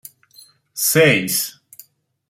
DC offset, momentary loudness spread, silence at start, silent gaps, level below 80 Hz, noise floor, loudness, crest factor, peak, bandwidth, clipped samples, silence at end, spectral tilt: under 0.1%; 14 LU; 0.75 s; none; -60 dBFS; -50 dBFS; -16 LUFS; 20 dB; -2 dBFS; 16.5 kHz; under 0.1%; 0.8 s; -3 dB/octave